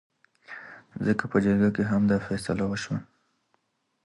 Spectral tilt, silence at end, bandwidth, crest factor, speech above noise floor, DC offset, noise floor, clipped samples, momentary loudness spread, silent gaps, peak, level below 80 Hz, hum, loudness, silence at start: -7 dB/octave; 1 s; 11.5 kHz; 18 dB; 48 dB; under 0.1%; -73 dBFS; under 0.1%; 19 LU; none; -10 dBFS; -54 dBFS; none; -26 LUFS; 0.5 s